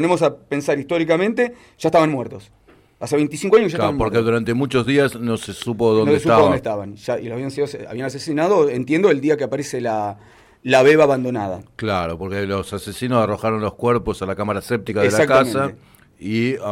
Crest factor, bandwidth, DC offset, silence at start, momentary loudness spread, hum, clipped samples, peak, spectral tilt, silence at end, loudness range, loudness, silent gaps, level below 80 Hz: 14 dB; 15.5 kHz; under 0.1%; 0 s; 12 LU; none; under 0.1%; -4 dBFS; -6 dB/octave; 0 s; 3 LU; -19 LUFS; none; -48 dBFS